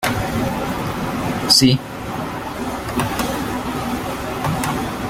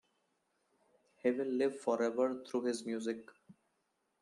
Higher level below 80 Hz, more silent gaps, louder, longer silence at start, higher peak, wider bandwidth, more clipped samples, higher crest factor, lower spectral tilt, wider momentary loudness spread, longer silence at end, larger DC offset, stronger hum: first, -38 dBFS vs -88 dBFS; neither; first, -20 LUFS vs -36 LUFS; second, 0 s vs 1.25 s; first, 0 dBFS vs -20 dBFS; first, 16.5 kHz vs 11.5 kHz; neither; about the same, 20 dB vs 18 dB; about the same, -4 dB/octave vs -4.5 dB/octave; first, 13 LU vs 6 LU; second, 0 s vs 0.7 s; neither; neither